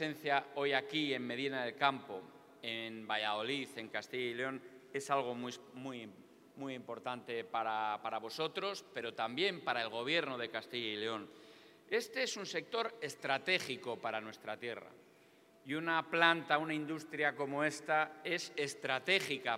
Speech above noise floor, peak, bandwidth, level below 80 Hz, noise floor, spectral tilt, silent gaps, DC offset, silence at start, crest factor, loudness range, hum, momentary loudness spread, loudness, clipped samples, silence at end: 27 dB; -12 dBFS; 16 kHz; under -90 dBFS; -65 dBFS; -3.5 dB/octave; none; under 0.1%; 0 s; 26 dB; 6 LU; none; 12 LU; -37 LUFS; under 0.1%; 0 s